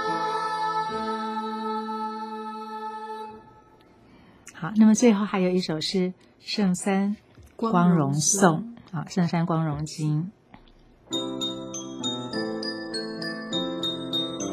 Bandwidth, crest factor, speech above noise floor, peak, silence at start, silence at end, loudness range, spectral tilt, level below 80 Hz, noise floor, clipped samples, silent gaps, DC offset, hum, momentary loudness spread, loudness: 15 kHz; 24 dB; 32 dB; -4 dBFS; 0 s; 0 s; 8 LU; -4.5 dB/octave; -62 dBFS; -54 dBFS; under 0.1%; none; under 0.1%; none; 14 LU; -26 LUFS